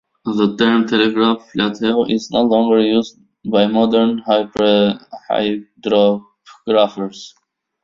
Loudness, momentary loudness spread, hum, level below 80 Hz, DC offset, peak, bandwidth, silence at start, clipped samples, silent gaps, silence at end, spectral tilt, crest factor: -16 LUFS; 11 LU; none; -56 dBFS; under 0.1%; -2 dBFS; 7.4 kHz; 0.25 s; under 0.1%; none; 0.55 s; -6 dB/octave; 14 dB